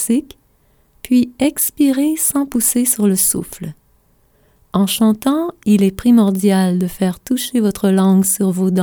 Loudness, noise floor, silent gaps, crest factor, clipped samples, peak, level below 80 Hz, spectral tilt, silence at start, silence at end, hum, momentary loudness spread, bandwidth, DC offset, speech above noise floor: -15 LUFS; -56 dBFS; none; 14 dB; under 0.1%; -2 dBFS; -48 dBFS; -5 dB/octave; 0 s; 0 s; none; 7 LU; over 20 kHz; under 0.1%; 41 dB